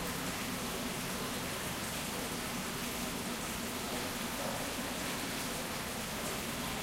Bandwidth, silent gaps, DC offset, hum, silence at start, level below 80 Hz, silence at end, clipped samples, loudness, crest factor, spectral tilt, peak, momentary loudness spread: 16 kHz; none; under 0.1%; none; 0 s; -54 dBFS; 0 s; under 0.1%; -37 LUFS; 14 dB; -3 dB/octave; -24 dBFS; 1 LU